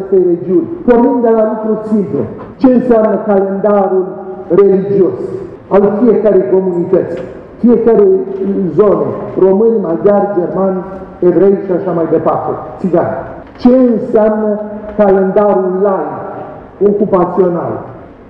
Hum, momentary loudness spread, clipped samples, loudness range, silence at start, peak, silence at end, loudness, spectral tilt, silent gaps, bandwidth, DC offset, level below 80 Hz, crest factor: none; 12 LU; under 0.1%; 2 LU; 0 s; 0 dBFS; 0 s; -11 LUFS; -11 dB/octave; none; 5.6 kHz; under 0.1%; -44 dBFS; 10 dB